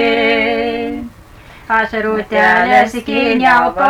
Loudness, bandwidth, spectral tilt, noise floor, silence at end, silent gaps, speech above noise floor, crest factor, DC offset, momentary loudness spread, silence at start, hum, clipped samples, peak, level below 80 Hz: -13 LUFS; 19 kHz; -4.5 dB/octave; -38 dBFS; 0 s; none; 26 dB; 12 dB; under 0.1%; 11 LU; 0 s; none; under 0.1%; -2 dBFS; -42 dBFS